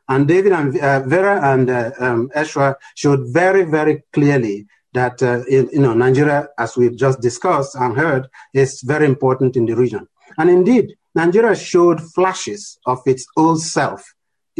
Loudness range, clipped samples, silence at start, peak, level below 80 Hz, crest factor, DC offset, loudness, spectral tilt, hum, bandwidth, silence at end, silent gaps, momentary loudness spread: 2 LU; under 0.1%; 0.1 s; -4 dBFS; -54 dBFS; 12 dB; under 0.1%; -16 LUFS; -6.5 dB/octave; none; 10.5 kHz; 0.6 s; none; 8 LU